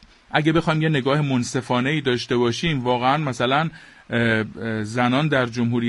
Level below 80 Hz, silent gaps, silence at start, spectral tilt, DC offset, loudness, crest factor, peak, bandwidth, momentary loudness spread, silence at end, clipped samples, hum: -52 dBFS; none; 0.3 s; -6 dB/octave; under 0.1%; -21 LUFS; 18 dB; -2 dBFS; 11.5 kHz; 5 LU; 0 s; under 0.1%; none